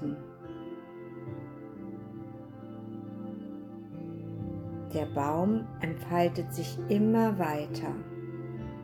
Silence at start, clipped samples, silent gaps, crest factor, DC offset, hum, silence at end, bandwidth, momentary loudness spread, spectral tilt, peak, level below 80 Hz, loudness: 0 s; under 0.1%; none; 20 dB; under 0.1%; none; 0 s; 17.5 kHz; 16 LU; -7.5 dB/octave; -12 dBFS; -60 dBFS; -33 LUFS